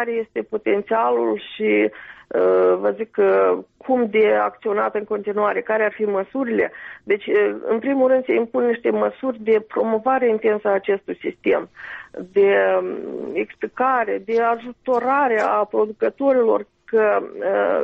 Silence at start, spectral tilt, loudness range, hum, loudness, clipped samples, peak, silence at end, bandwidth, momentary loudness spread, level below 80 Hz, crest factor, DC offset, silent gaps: 0 s; -7.5 dB/octave; 2 LU; none; -20 LUFS; under 0.1%; -6 dBFS; 0 s; 5.6 kHz; 9 LU; -64 dBFS; 12 dB; under 0.1%; none